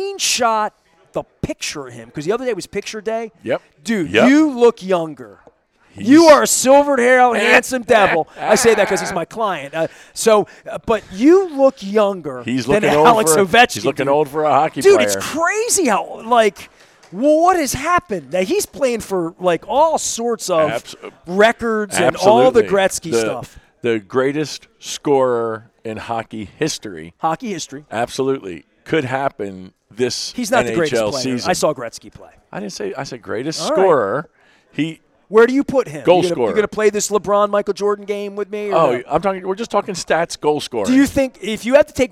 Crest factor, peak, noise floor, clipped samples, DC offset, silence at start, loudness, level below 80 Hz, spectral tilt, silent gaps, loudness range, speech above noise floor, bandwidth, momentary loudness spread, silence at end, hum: 16 dB; 0 dBFS; -51 dBFS; under 0.1%; under 0.1%; 0 s; -16 LUFS; -50 dBFS; -3.5 dB/octave; none; 9 LU; 35 dB; 16 kHz; 14 LU; 0.05 s; none